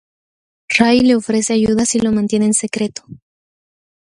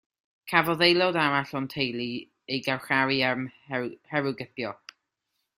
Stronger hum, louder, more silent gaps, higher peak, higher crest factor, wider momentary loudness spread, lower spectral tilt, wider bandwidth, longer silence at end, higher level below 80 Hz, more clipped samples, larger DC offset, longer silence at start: neither; first, -15 LUFS vs -26 LUFS; neither; first, 0 dBFS vs -4 dBFS; second, 16 dB vs 24 dB; second, 10 LU vs 14 LU; second, -4 dB/octave vs -5.5 dB/octave; second, 11.5 kHz vs 15.5 kHz; about the same, 0.9 s vs 0.85 s; first, -48 dBFS vs -68 dBFS; neither; neither; first, 0.7 s vs 0.45 s